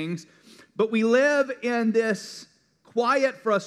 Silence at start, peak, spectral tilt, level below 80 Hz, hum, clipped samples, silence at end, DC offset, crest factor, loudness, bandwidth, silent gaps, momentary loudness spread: 0 s; -10 dBFS; -5 dB/octave; -82 dBFS; none; under 0.1%; 0 s; under 0.1%; 16 dB; -24 LUFS; 12.5 kHz; none; 17 LU